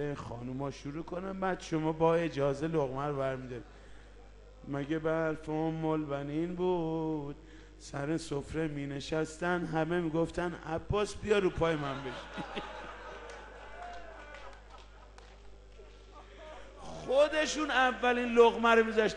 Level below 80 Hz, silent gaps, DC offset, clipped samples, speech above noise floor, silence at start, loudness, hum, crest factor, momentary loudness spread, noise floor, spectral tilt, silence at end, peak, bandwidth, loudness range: -54 dBFS; none; under 0.1%; under 0.1%; 21 dB; 0 s; -32 LUFS; 50 Hz at -55 dBFS; 22 dB; 20 LU; -53 dBFS; -5.5 dB/octave; 0 s; -10 dBFS; 11 kHz; 14 LU